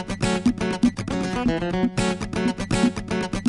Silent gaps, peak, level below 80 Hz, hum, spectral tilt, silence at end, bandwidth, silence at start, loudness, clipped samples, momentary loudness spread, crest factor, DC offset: none; -6 dBFS; -40 dBFS; none; -5.5 dB/octave; 0 s; 11.5 kHz; 0 s; -24 LUFS; under 0.1%; 4 LU; 18 dB; under 0.1%